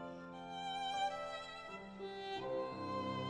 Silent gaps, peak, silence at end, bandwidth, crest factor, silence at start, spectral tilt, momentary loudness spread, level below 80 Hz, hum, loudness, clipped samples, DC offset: none; -30 dBFS; 0 s; 11 kHz; 14 dB; 0 s; -4.5 dB/octave; 10 LU; -74 dBFS; none; -43 LUFS; under 0.1%; under 0.1%